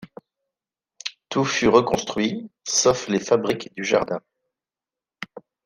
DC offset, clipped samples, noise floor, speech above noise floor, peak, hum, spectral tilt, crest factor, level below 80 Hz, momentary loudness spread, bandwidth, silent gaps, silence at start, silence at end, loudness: under 0.1%; under 0.1%; under -90 dBFS; over 69 dB; -2 dBFS; none; -3.5 dB/octave; 22 dB; -56 dBFS; 17 LU; 15.5 kHz; none; 0 s; 0.25 s; -22 LUFS